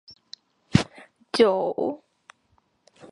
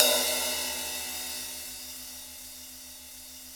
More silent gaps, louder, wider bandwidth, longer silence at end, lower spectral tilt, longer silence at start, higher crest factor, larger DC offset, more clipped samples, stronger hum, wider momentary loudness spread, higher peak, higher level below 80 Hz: neither; first, -24 LUFS vs -30 LUFS; second, 11.5 kHz vs over 20 kHz; about the same, 0.05 s vs 0 s; first, -6 dB/octave vs 0.5 dB/octave; first, 0.75 s vs 0 s; second, 24 dB vs 32 dB; neither; neither; neither; first, 25 LU vs 17 LU; about the same, -2 dBFS vs 0 dBFS; first, -52 dBFS vs -60 dBFS